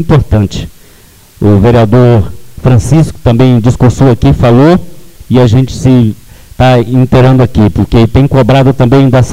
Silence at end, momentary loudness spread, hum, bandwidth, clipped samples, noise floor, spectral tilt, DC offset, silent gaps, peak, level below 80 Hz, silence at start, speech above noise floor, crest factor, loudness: 0 s; 6 LU; none; 12 kHz; 0.5%; -38 dBFS; -8 dB/octave; under 0.1%; none; 0 dBFS; -22 dBFS; 0 s; 32 dB; 6 dB; -7 LUFS